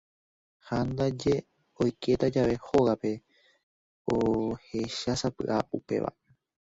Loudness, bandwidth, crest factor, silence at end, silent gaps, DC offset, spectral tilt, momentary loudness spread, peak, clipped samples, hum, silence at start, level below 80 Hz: -29 LUFS; 8 kHz; 20 dB; 0.6 s; 3.63-4.05 s; under 0.1%; -6.5 dB/octave; 9 LU; -10 dBFS; under 0.1%; none; 0.65 s; -54 dBFS